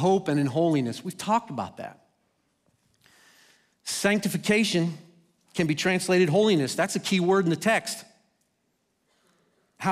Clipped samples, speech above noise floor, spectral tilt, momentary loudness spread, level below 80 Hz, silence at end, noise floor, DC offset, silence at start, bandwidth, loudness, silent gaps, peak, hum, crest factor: under 0.1%; 49 dB; -5 dB/octave; 14 LU; -70 dBFS; 0 s; -74 dBFS; under 0.1%; 0 s; 15.5 kHz; -25 LUFS; none; -10 dBFS; none; 16 dB